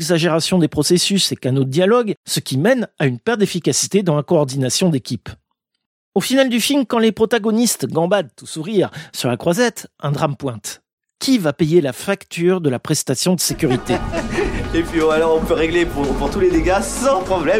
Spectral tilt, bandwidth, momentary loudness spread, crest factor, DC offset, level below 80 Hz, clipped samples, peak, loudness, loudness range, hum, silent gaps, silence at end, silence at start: -4.5 dB/octave; 16.5 kHz; 8 LU; 16 dB; under 0.1%; -36 dBFS; under 0.1%; -2 dBFS; -17 LUFS; 3 LU; none; 2.17-2.24 s, 5.86-6.12 s, 10.93-10.98 s; 0 s; 0 s